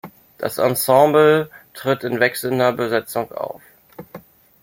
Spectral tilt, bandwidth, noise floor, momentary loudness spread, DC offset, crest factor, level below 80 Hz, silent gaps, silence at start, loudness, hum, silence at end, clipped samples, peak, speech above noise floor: -4.5 dB/octave; 16.5 kHz; -42 dBFS; 18 LU; under 0.1%; 18 dB; -62 dBFS; none; 0.05 s; -18 LUFS; none; 0.45 s; under 0.1%; -2 dBFS; 25 dB